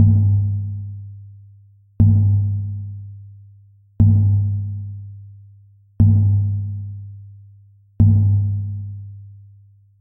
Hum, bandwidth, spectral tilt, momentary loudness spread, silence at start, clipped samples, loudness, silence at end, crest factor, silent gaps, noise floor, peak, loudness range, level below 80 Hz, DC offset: none; 1 kHz; -14.5 dB/octave; 24 LU; 0 s; under 0.1%; -18 LUFS; 0.65 s; 16 dB; none; -49 dBFS; -2 dBFS; 3 LU; -36 dBFS; under 0.1%